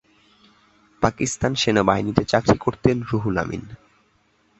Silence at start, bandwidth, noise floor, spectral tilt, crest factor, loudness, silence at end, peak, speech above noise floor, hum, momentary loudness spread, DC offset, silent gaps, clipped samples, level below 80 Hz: 1 s; 8.2 kHz; -62 dBFS; -5 dB/octave; 22 dB; -21 LUFS; 0.85 s; -2 dBFS; 42 dB; none; 6 LU; under 0.1%; none; under 0.1%; -44 dBFS